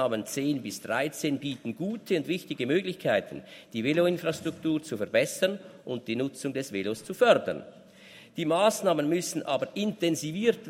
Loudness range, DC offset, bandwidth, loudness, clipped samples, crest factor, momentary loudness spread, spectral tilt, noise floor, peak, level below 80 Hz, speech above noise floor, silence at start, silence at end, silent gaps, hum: 3 LU; under 0.1%; 16 kHz; -29 LUFS; under 0.1%; 22 dB; 10 LU; -4.5 dB/octave; -52 dBFS; -6 dBFS; -74 dBFS; 23 dB; 0 s; 0 s; none; none